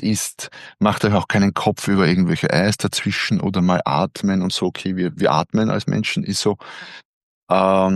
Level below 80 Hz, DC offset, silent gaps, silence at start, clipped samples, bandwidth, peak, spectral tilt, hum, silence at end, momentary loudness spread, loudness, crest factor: -52 dBFS; under 0.1%; 7.05-7.47 s; 0 s; under 0.1%; 12.5 kHz; -2 dBFS; -5 dB/octave; none; 0 s; 6 LU; -19 LUFS; 18 dB